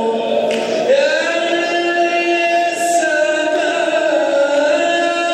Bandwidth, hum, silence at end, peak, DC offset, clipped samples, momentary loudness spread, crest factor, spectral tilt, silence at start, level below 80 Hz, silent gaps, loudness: 14 kHz; none; 0 s; -4 dBFS; under 0.1%; under 0.1%; 3 LU; 12 dB; -2 dB/octave; 0 s; -70 dBFS; none; -15 LUFS